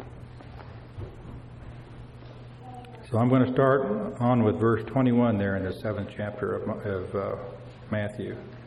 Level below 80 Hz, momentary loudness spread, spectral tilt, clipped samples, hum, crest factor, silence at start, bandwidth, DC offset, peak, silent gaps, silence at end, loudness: -52 dBFS; 22 LU; -9.5 dB/octave; under 0.1%; none; 20 dB; 0 s; 11 kHz; under 0.1%; -8 dBFS; none; 0 s; -26 LUFS